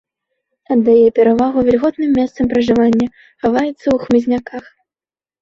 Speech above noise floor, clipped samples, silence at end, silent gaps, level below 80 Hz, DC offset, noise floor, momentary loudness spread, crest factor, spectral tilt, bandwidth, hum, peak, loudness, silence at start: over 76 dB; under 0.1%; 0.8 s; none; -46 dBFS; under 0.1%; under -90 dBFS; 10 LU; 14 dB; -7 dB/octave; 7.2 kHz; none; -2 dBFS; -14 LUFS; 0.7 s